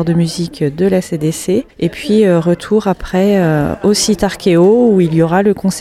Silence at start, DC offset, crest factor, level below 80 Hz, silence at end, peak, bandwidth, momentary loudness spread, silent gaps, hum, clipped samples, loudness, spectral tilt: 0 s; under 0.1%; 12 dB; -38 dBFS; 0 s; 0 dBFS; 15 kHz; 8 LU; none; none; under 0.1%; -13 LUFS; -6 dB/octave